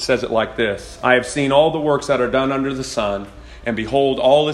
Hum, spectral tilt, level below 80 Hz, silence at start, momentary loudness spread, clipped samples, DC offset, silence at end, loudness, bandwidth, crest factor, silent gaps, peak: none; -4.5 dB/octave; -42 dBFS; 0 s; 9 LU; under 0.1%; under 0.1%; 0 s; -18 LUFS; 12.5 kHz; 18 dB; none; 0 dBFS